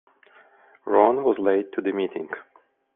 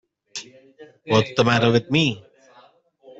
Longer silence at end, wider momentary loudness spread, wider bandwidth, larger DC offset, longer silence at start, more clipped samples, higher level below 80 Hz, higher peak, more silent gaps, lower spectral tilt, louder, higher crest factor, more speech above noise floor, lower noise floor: second, 0.55 s vs 1 s; about the same, 17 LU vs 18 LU; second, 3.8 kHz vs 8 kHz; neither; first, 0.85 s vs 0.35 s; neither; second, -70 dBFS vs -58 dBFS; about the same, -4 dBFS vs -4 dBFS; neither; about the same, -4.5 dB/octave vs -5.5 dB/octave; second, -23 LUFS vs -19 LUFS; about the same, 20 dB vs 20 dB; about the same, 33 dB vs 33 dB; about the same, -55 dBFS vs -54 dBFS